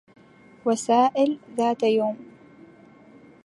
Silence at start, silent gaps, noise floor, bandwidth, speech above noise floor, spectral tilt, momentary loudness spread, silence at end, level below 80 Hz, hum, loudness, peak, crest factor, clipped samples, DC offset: 0.65 s; none; -50 dBFS; 11.5 kHz; 29 dB; -4.5 dB/octave; 10 LU; 1.2 s; -74 dBFS; none; -23 LUFS; -8 dBFS; 18 dB; under 0.1%; under 0.1%